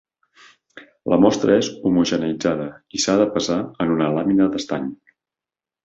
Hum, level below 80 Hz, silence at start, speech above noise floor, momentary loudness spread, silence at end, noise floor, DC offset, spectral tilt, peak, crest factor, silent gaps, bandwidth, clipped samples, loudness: none; -54 dBFS; 0.75 s; 71 dB; 11 LU; 0.9 s; -90 dBFS; under 0.1%; -5 dB/octave; -2 dBFS; 18 dB; none; 8 kHz; under 0.1%; -20 LUFS